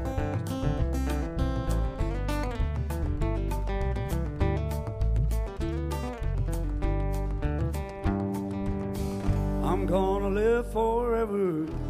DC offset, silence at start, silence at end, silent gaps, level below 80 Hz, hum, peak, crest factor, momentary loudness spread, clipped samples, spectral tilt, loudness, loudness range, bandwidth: under 0.1%; 0 s; 0 s; none; -32 dBFS; none; -14 dBFS; 14 dB; 6 LU; under 0.1%; -7.5 dB/octave; -30 LUFS; 3 LU; 15.5 kHz